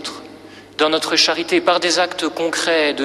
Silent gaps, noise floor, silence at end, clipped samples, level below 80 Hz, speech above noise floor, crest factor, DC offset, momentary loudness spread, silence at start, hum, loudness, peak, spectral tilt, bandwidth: none; -40 dBFS; 0 s; under 0.1%; -62 dBFS; 22 dB; 16 dB; under 0.1%; 12 LU; 0 s; none; -17 LUFS; -2 dBFS; -1.5 dB/octave; 14 kHz